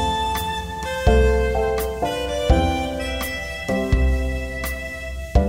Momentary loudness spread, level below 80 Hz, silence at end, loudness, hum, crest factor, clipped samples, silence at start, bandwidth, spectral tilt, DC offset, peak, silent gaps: 9 LU; -24 dBFS; 0 s; -22 LUFS; none; 18 dB; under 0.1%; 0 s; 16 kHz; -5.5 dB/octave; 0.2%; -4 dBFS; none